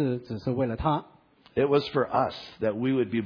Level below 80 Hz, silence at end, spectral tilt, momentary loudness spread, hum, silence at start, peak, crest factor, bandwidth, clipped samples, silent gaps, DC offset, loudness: -52 dBFS; 0 s; -8.5 dB/octave; 7 LU; none; 0 s; -10 dBFS; 16 dB; 5.4 kHz; under 0.1%; none; under 0.1%; -28 LUFS